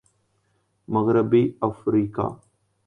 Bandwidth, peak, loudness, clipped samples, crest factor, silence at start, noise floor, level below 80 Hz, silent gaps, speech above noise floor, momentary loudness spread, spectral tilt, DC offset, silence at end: 9 kHz; -6 dBFS; -23 LUFS; under 0.1%; 18 dB; 0.9 s; -69 dBFS; -56 dBFS; none; 47 dB; 9 LU; -10 dB/octave; under 0.1%; 0.5 s